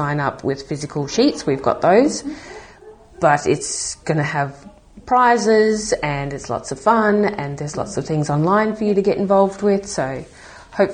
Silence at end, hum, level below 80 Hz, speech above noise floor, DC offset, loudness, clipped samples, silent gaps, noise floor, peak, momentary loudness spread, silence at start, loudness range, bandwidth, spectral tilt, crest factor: 0 s; none; -48 dBFS; 25 dB; under 0.1%; -18 LUFS; under 0.1%; none; -43 dBFS; 0 dBFS; 12 LU; 0 s; 2 LU; 9.8 kHz; -5 dB/octave; 18 dB